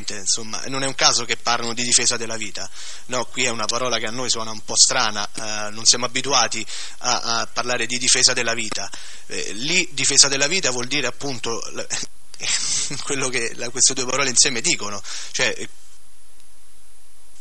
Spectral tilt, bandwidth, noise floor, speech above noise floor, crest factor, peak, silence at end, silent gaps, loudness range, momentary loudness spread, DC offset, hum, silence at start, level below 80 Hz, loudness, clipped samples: -0.5 dB/octave; 12 kHz; -52 dBFS; 30 dB; 24 dB; 0 dBFS; 1.75 s; none; 4 LU; 14 LU; 5%; none; 0 s; -58 dBFS; -19 LUFS; under 0.1%